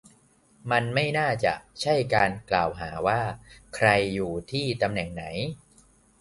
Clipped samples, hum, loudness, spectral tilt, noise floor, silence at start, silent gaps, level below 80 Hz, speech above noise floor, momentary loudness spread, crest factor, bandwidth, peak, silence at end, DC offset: under 0.1%; none; -26 LUFS; -5.5 dB/octave; -60 dBFS; 0.65 s; none; -52 dBFS; 34 dB; 11 LU; 24 dB; 11.5 kHz; -4 dBFS; 0.65 s; under 0.1%